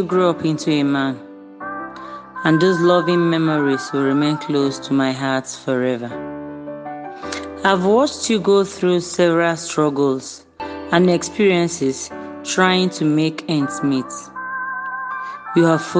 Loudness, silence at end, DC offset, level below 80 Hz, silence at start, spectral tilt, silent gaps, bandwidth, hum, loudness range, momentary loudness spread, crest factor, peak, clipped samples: -18 LUFS; 0 s; under 0.1%; -58 dBFS; 0 s; -5 dB/octave; none; 9.8 kHz; none; 3 LU; 15 LU; 18 dB; 0 dBFS; under 0.1%